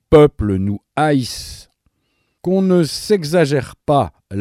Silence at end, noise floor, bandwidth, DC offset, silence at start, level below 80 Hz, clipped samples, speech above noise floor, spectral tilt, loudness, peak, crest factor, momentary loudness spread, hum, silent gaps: 0 s; -67 dBFS; 14.5 kHz; under 0.1%; 0.1 s; -38 dBFS; under 0.1%; 51 dB; -6.5 dB/octave; -17 LUFS; 0 dBFS; 16 dB; 12 LU; none; none